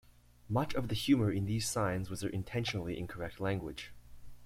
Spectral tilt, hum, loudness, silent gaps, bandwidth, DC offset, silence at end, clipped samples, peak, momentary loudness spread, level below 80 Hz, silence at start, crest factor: -5.5 dB/octave; none; -35 LUFS; none; 16 kHz; under 0.1%; 0 s; under 0.1%; -16 dBFS; 11 LU; -54 dBFS; 0.45 s; 18 dB